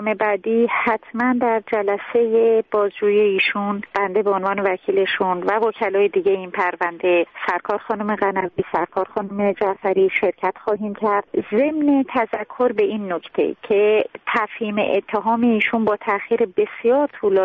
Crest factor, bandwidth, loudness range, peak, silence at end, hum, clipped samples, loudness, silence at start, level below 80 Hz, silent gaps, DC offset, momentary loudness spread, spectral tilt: 14 dB; 5 kHz; 2 LU; -6 dBFS; 0 s; none; under 0.1%; -20 LUFS; 0 s; -62 dBFS; none; under 0.1%; 6 LU; -7.5 dB/octave